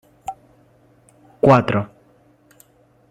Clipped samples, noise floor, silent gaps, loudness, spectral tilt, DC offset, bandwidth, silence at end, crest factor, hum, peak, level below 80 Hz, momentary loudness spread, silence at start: under 0.1%; -55 dBFS; none; -17 LUFS; -8 dB/octave; under 0.1%; 13.5 kHz; 1.25 s; 22 dB; none; -2 dBFS; -56 dBFS; 21 LU; 0.3 s